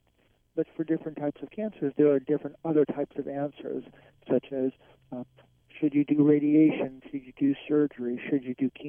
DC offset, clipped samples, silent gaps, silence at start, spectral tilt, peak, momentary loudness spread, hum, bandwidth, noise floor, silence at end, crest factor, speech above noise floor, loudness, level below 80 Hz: under 0.1%; under 0.1%; none; 0.55 s; -10.5 dB/octave; -10 dBFS; 16 LU; none; 3.5 kHz; -68 dBFS; 0 s; 18 dB; 40 dB; -28 LUFS; -70 dBFS